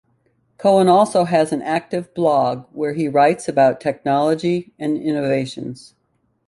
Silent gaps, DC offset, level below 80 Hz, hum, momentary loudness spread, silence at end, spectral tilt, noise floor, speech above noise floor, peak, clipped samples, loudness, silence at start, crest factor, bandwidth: none; under 0.1%; -60 dBFS; none; 10 LU; 0.75 s; -6 dB/octave; -66 dBFS; 49 dB; -2 dBFS; under 0.1%; -18 LUFS; 0.6 s; 16 dB; 11.5 kHz